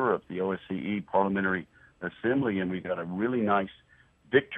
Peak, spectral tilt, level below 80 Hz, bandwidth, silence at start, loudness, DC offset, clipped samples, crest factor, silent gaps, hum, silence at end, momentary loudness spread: -8 dBFS; -9 dB/octave; -64 dBFS; 3.9 kHz; 0 s; -29 LUFS; under 0.1%; under 0.1%; 22 dB; none; none; 0 s; 7 LU